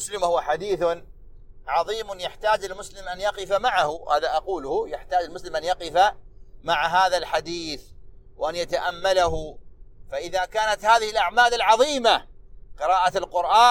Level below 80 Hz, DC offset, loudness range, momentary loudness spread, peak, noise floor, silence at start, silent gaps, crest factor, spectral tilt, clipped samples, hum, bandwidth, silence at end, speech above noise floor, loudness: -46 dBFS; under 0.1%; 6 LU; 13 LU; -4 dBFS; -43 dBFS; 0 s; none; 20 dB; -2.5 dB/octave; under 0.1%; none; 16 kHz; 0 s; 21 dB; -23 LUFS